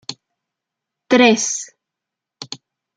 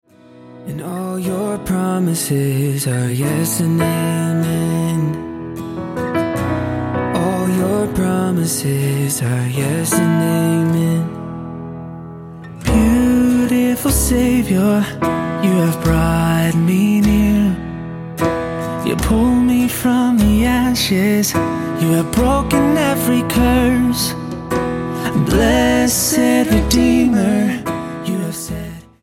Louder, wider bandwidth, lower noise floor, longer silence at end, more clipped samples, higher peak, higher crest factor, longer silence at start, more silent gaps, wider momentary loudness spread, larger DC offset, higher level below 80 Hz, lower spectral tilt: about the same, -15 LUFS vs -16 LUFS; second, 9.4 kHz vs 17 kHz; first, -84 dBFS vs -42 dBFS; first, 0.4 s vs 0.2 s; neither; about the same, -2 dBFS vs 0 dBFS; about the same, 20 dB vs 16 dB; second, 0.1 s vs 0.35 s; neither; first, 23 LU vs 12 LU; neither; second, -68 dBFS vs -30 dBFS; second, -2.5 dB/octave vs -5.5 dB/octave